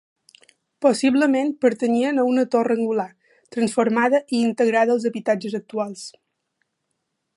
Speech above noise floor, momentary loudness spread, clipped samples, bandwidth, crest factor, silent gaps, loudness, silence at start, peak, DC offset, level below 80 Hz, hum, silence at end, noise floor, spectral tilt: 56 dB; 10 LU; under 0.1%; 11.5 kHz; 18 dB; none; -21 LUFS; 0.8 s; -4 dBFS; under 0.1%; -72 dBFS; none; 1.3 s; -76 dBFS; -5 dB/octave